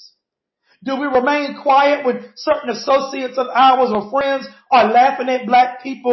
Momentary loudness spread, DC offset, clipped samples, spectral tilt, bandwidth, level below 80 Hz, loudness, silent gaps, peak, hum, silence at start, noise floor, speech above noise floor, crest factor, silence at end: 10 LU; under 0.1%; under 0.1%; -4.5 dB/octave; 6.2 kHz; -60 dBFS; -16 LUFS; none; -2 dBFS; none; 0.85 s; -77 dBFS; 61 dB; 14 dB; 0 s